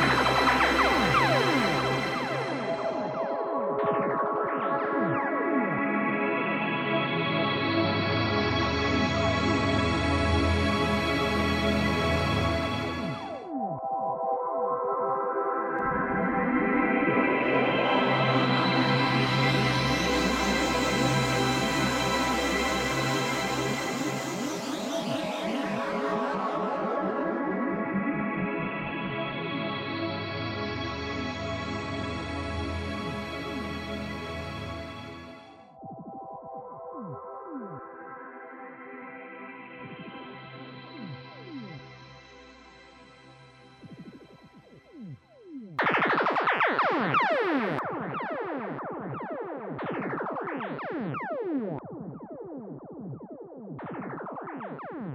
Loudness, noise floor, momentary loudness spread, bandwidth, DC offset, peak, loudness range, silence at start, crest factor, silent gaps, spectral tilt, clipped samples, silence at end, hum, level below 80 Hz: -27 LUFS; -53 dBFS; 18 LU; 16 kHz; under 0.1%; -10 dBFS; 17 LU; 0 s; 18 dB; none; -5 dB/octave; under 0.1%; 0 s; none; -46 dBFS